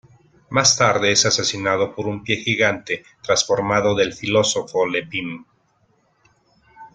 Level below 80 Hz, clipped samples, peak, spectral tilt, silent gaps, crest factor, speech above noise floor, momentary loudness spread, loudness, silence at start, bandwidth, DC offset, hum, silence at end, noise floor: -54 dBFS; under 0.1%; 0 dBFS; -2.5 dB/octave; none; 20 dB; 43 dB; 12 LU; -19 LUFS; 0.5 s; 11 kHz; under 0.1%; none; 0.1 s; -62 dBFS